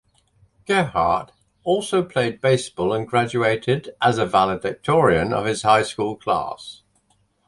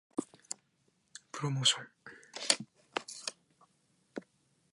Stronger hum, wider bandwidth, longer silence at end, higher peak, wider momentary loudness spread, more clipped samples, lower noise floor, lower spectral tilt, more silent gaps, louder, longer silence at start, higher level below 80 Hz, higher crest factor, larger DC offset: neither; about the same, 11.5 kHz vs 11.5 kHz; first, 0.75 s vs 0.55 s; first, -2 dBFS vs -8 dBFS; second, 7 LU vs 21 LU; neither; second, -64 dBFS vs -75 dBFS; first, -5 dB/octave vs -2.5 dB/octave; neither; first, -21 LUFS vs -34 LUFS; first, 0.7 s vs 0.15 s; first, -50 dBFS vs -84 dBFS; second, 20 dB vs 32 dB; neither